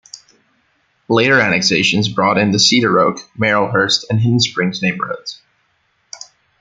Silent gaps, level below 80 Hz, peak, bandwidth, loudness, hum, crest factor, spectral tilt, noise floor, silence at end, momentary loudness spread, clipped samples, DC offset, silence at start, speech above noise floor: none; -54 dBFS; 0 dBFS; 9.4 kHz; -14 LUFS; none; 16 dB; -4 dB/octave; -62 dBFS; 0.45 s; 13 LU; under 0.1%; under 0.1%; 0.15 s; 48 dB